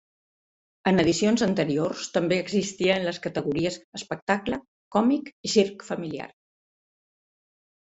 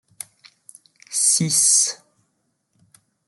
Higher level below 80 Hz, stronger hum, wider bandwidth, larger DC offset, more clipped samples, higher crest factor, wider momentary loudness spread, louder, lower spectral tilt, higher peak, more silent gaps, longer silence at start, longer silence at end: first, -58 dBFS vs -74 dBFS; neither; second, 8.2 kHz vs 12.5 kHz; neither; neither; about the same, 20 dB vs 20 dB; second, 12 LU vs 24 LU; second, -25 LUFS vs -16 LUFS; first, -5 dB/octave vs -1.5 dB/octave; about the same, -6 dBFS vs -4 dBFS; first, 3.84-3.92 s, 4.22-4.27 s, 4.68-4.91 s, 5.33-5.44 s vs none; second, 0.85 s vs 1.1 s; first, 1.6 s vs 1.3 s